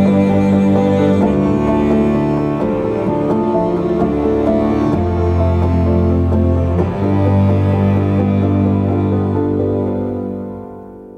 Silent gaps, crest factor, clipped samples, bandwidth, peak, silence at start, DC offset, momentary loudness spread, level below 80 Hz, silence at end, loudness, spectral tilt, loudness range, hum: none; 12 dB; under 0.1%; 7 kHz; -2 dBFS; 0 s; under 0.1%; 5 LU; -30 dBFS; 0 s; -15 LUFS; -10 dB/octave; 1 LU; none